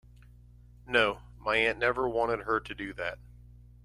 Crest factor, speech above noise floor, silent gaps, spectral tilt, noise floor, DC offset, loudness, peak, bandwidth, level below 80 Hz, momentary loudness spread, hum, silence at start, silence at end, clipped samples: 22 dB; 25 dB; none; -5 dB/octave; -54 dBFS; under 0.1%; -29 LUFS; -10 dBFS; 12 kHz; -52 dBFS; 11 LU; 60 Hz at -50 dBFS; 0.85 s; 0.7 s; under 0.1%